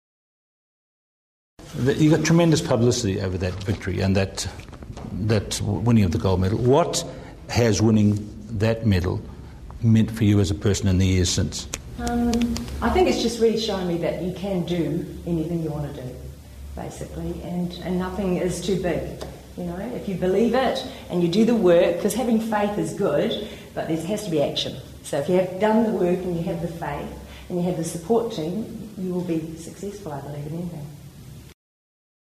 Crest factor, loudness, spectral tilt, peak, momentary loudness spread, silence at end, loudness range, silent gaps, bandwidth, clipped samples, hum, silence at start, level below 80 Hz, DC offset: 18 dB; -23 LUFS; -6 dB/octave; -6 dBFS; 15 LU; 0.8 s; 7 LU; none; 15 kHz; under 0.1%; none; 1.6 s; -42 dBFS; under 0.1%